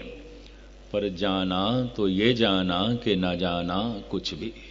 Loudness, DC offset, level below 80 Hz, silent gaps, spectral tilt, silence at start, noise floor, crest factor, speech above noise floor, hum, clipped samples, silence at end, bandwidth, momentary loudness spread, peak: -26 LUFS; under 0.1%; -48 dBFS; none; -6.5 dB/octave; 0 s; -47 dBFS; 20 dB; 21 dB; none; under 0.1%; 0 s; 7.6 kHz; 10 LU; -6 dBFS